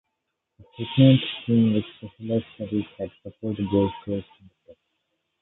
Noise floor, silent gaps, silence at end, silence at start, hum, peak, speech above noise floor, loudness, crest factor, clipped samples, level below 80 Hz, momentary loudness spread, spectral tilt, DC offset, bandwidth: -80 dBFS; none; 1.2 s; 0.8 s; none; -4 dBFS; 57 dB; -24 LUFS; 20 dB; under 0.1%; -54 dBFS; 18 LU; -11.5 dB/octave; under 0.1%; 4.1 kHz